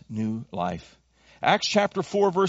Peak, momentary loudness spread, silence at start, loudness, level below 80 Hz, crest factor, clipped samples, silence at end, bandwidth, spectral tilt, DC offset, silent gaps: -6 dBFS; 9 LU; 0.1 s; -25 LUFS; -60 dBFS; 20 dB; under 0.1%; 0 s; 8 kHz; -3.5 dB/octave; under 0.1%; none